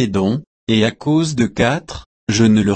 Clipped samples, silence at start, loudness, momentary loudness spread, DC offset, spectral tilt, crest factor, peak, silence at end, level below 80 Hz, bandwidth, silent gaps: under 0.1%; 0 s; -17 LUFS; 10 LU; under 0.1%; -5.5 dB/octave; 14 dB; -2 dBFS; 0 s; -42 dBFS; 8.8 kHz; 0.47-0.67 s, 2.06-2.27 s